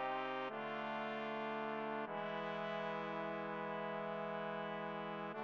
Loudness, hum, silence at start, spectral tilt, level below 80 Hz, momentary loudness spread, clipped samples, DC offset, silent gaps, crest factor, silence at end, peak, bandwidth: -43 LUFS; none; 0 s; -3 dB/octave; under -90 dBFS; 1 LU; under 0.1%; under 0.1%; none; 16 dB; 0 s; -28 dBFS; 7.4 kHz